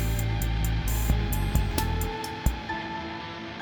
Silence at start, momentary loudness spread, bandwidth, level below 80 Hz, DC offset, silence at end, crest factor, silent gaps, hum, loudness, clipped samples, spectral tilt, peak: 0 s; 7 LU; over 20 kHz; -30 dBFS; under 0.1%; 0 s; 18 dB; none; none; -29 LUFS; under 0.1%; -5 dB/octave; -10 dBFS